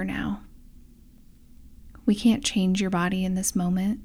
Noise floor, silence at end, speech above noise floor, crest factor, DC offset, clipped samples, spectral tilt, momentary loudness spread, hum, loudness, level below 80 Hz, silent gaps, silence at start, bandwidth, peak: -51 dBFS; 0 s; 27 dB; 18 dB; under 0.1%; under 0.1%; -5 dB/octave; 9 LU; none; -25 LUFS; -46 dBFS; none; 0 s; 16 kHz; -10 dBFS